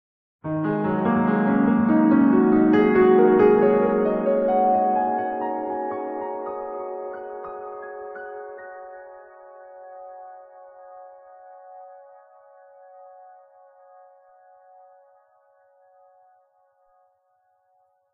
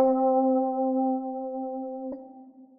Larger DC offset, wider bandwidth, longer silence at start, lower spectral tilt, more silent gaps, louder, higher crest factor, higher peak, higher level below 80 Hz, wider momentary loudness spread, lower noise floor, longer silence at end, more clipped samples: neither; first, 4.5 kHz vs 1.9 kHz; first, 0.45 s vs 0 s; about the same, -11 dB/octave vs -10.5 dB/octave; neither; first, -20 LUFS vs -27 LUFS; about the same, 18 dB vs 16 dB; first, -6 dBFS vs -10 dBFS; first, -58 dBFS vs -72 dBFS; first, 25 LU vs 14 LU; first, -67 dBFS vs -49 dBFS; first, 6.2 s vs 0.15 s; neither